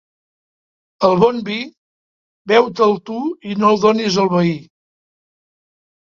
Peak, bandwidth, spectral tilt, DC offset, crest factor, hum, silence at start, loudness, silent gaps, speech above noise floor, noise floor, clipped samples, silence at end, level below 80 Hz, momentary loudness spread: 0 dBFS; 7.4 kHz; -6 dB/octave; under 0.1%; 18 dB; none; 1 s; -16 LUFS; 1.77-2.45 s; over 75 dB; under -90 dBFS; under 0.1%; 1.5 s; -58 dBFS; 11 LU